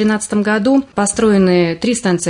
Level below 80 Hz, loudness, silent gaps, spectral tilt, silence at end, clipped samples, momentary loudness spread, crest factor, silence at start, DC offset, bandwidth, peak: -46 dBFS; -14 LUFS; none; -5 dB/octave; 0 s; under 0.1%; 5 LU; 10 dB; 0 s; under 0.1%; 11 kHz; -2 dBFS